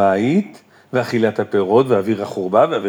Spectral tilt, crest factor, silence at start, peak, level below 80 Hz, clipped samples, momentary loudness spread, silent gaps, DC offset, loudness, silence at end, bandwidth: -7 dB/octave; 14 dB; 0 s; -2 dBFS; -70 dBFS; under 0.1%; 7 LU; none; under 0.1%; -17 LUFS; 0 s; 18 kHz